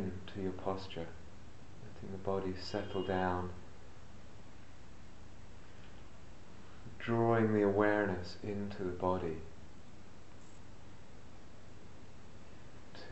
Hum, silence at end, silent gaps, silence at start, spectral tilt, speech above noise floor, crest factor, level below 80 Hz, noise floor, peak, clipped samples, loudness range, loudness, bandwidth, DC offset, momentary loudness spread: none; 0 s; none; 0 s; -7 dB/octave; 21 dB; 24 dB; -60 dBFS; -57 dBFS; -16 dBFS; under 0.1%; 22 LU; -36 LUFS; 8.2 kHz; 0.6%; 26 LU